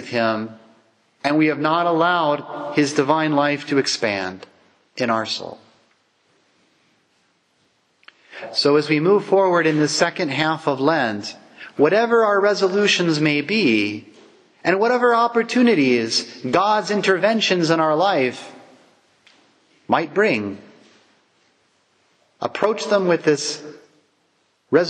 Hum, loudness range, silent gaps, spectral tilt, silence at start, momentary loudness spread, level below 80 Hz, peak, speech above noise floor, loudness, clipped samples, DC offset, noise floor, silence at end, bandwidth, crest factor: none; 8 LU; none; -4.5 dB/octave; 0 s; 13 LU; -72 dBFS; -2 dBFS; 46 dB; -19 LUFS; under 0.1%; under 0.1%; -65 dBFS; 0 s; 10.5 kHz; 18 dB